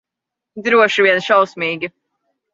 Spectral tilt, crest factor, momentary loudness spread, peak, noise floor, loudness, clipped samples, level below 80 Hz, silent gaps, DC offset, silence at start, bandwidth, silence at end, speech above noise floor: -4 dB/octave; 16 dB; 13 LU; -2 dBFS; -83 dBFS; -15 LUFS; under 0.1%; -66 dBFS; none; under 0.1%; 0.55 s; 7.8 kHz; 0.65 s; 68 dB